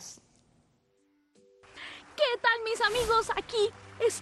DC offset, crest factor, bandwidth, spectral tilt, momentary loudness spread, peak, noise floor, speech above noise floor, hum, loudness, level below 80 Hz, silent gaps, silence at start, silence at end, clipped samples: under 0.1%; 20 dB; 12.5 kHz; -1.5 dB/octave; 18 LU; -10 dBFS; -70 dBFS; 42 dB; none; -28 LUFS; -56 dBFS; none; 0 s; 0 s; under 0.1%